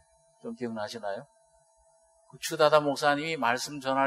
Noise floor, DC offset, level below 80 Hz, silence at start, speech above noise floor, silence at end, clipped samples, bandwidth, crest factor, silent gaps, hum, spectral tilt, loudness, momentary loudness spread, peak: -65 dBFS; under 0.1%; -74 dBFS; 0.45 s; 37 dB; 0 s; under 0.1%; 13 kHz; 24 dB; none; none; -3.5 dB/octave; -28 LUFS; 16 LU; -6 dBFS